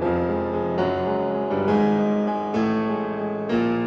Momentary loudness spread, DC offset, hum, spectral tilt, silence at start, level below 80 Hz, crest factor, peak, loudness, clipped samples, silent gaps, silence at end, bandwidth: 5 LU; under 0.1%; none; -8.5 dB/octave; 0 s; -50 dBFS; 14 dB; -8 dBFS; -23 LUFS; under 0.1%; none; 0 s; 6.6 kHz